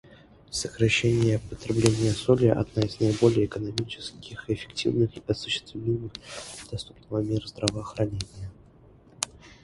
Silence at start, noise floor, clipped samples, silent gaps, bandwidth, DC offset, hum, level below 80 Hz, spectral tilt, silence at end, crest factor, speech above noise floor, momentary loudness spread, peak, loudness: 0.1 s; -54 dBFS; under 0.1%; none; 11.5 kHz; under 0.1%; none; -48 dBFS; -5.5 dB/octave; 0.15 s; 26 dB; 28 dB; 16 LU; -2 dBFS; -27 LUFS